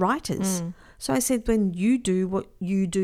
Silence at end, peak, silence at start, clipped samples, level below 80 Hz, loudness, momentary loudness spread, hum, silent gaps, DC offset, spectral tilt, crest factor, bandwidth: 0 s; -8 dBFS; 0 s; under 0.1%; -44 dBFS; -25 LUFS; 7 LU; none; none; under 0.1%; -5.5 dB/octave; 16 dB; 16 kHz